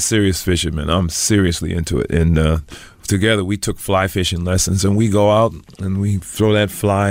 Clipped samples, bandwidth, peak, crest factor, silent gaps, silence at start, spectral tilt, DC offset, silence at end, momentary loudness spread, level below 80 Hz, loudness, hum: under 0.1%; 16.5 kHz; -2 dBFS; 14 dB; none; 0 s; -5 dB/octave; under 0.1%; 0 s; 7 LU; -30 dBFS; -17 LUFS; none